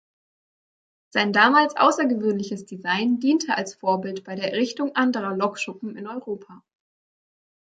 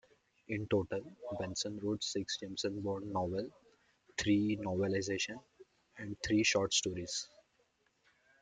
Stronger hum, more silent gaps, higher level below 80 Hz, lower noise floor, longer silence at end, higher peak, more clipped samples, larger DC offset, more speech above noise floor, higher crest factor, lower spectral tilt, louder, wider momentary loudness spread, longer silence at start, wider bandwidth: neither; neither; second, -74 dBFS vs -66 dBFS; first, under -90 dBFS vs -76 dBFS; about the same, 1.2 s vs 1.15 s; first, -2 dBFS vs -18 dBFS; neither; neither; first, over 67 dB vs 40 dB; about the same, 22 dB vs 20 dB; about the same, -4.5 dB/octave vs -4 dB/octave; first, -22 LUFS vs -36 LUFS; first, 15 LU vs 12 LU; first, 1.15 s vs 0.5 s; about the same, 9.2 kHz vs 9.6 kHz